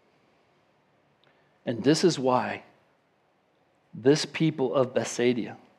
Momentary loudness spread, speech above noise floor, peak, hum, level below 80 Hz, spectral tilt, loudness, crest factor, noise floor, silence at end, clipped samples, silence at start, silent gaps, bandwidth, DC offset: 12 LU; 43 dB; -8 dBFS; none; -80 dBFS; -5 dB/octave; -26 LUFS; 20 dB; -68 dBFS; 0.2 s; under 0.1%; 1.65 s; none; 12.5 kHz; under 0.1%